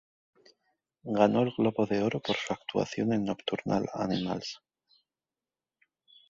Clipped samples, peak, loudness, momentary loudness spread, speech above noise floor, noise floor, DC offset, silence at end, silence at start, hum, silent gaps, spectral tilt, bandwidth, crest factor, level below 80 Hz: under 0.1%; -8 dBFS; -30 LUFS; 10 LU; over 61 dB; under -90 dBFS; under 0.1%; 1.75 s; 1.05 s; none; none; -6 dB/octave; 7.8 kHz; 24 dB; -66 dBFS